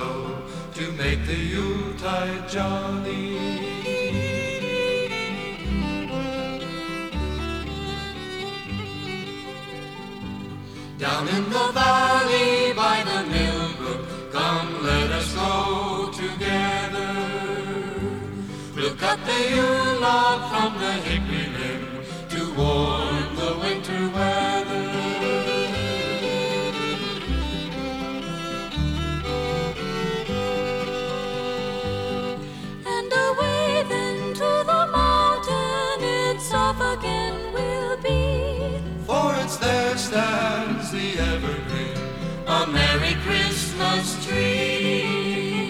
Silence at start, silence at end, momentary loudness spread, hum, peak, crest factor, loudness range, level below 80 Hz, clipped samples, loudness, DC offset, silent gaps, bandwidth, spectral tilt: 0 s; 0 s; 11 LU; none; -8 dBFS; 18 dB; 6 LU; -36 dBFS; under 0.1%; -24 LUFS; under 0.1%; none; 17.5 kHz; -4.5 dB/octave